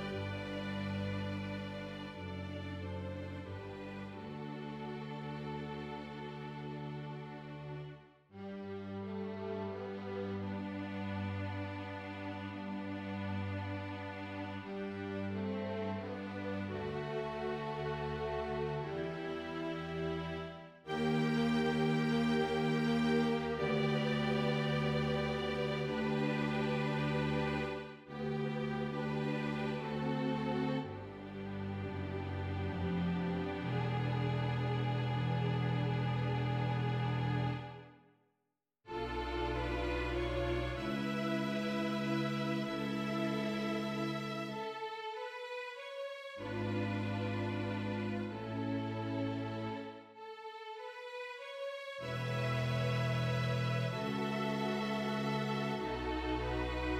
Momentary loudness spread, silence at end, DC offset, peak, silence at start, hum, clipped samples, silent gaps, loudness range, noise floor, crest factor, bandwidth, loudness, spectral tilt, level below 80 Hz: 11 LU; 0 s; under 0.1%; -22 dBFS; 0 s; none; under 0.1%; none; 10 LU; -86 dBFS; 16 dB; 14 kHz; -38 LUFS; -7 dB/octave; -56 dBFS